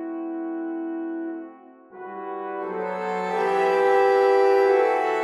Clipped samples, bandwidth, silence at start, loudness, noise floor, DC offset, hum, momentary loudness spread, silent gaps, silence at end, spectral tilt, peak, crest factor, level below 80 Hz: under 0.1%; 11 kHz; 0 s; -22 LUFS; -46 dBFS; under 0.1%; none; 16 LU; none; 0 s; -5.5 dB/octave; -8 dBFS; 14 dB; -84 dBFS